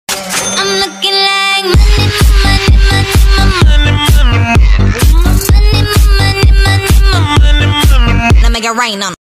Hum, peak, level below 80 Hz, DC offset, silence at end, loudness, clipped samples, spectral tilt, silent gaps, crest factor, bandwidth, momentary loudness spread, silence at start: none; 0 dBFS; -10 dBFS; under 0.1%; 0.2 s; -9 LUFS; 0.3%; -4 dB/octave; none; 6 dB; 15.5 kHz; 3 LU; 0.1 s